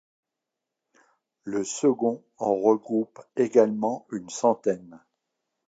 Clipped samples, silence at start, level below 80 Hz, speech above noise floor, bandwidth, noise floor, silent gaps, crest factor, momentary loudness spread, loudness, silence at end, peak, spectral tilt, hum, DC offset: under 0.1%; 1.45 s; -76 dBFS; 61 dB; 9.2 kHz; -86 dBFS; none; 20 dB; 12 LU; -25 LUFS; 0.7 s; -6 dBFS; -5.5 dB/octave; none; under 0.1%